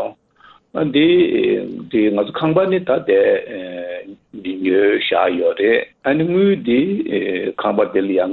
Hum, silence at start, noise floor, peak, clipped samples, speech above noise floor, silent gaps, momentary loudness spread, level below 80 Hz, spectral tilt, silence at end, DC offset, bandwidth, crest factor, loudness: none; 0 s; -49 dBFS; -2 dBFS; under 0.1%; 33 dB; none; 14 LU; -56 dBFS; -9.5 dB/octave; 0 s; under 0.1%; 4.3 kHz; 14 dB; -17 LUFS